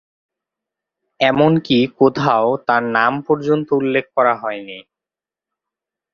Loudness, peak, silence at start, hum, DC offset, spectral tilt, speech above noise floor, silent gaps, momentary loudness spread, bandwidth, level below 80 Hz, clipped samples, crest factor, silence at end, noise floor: -16 LUFS; 0 dBFS; 1.2 s; none; under 0.1%; -7 dB/octave; 73 dB; none; 10 LU; 7 kHz; -58 dBFS; under 0.1%; 18 dB; 1.35 s; -89 dBFS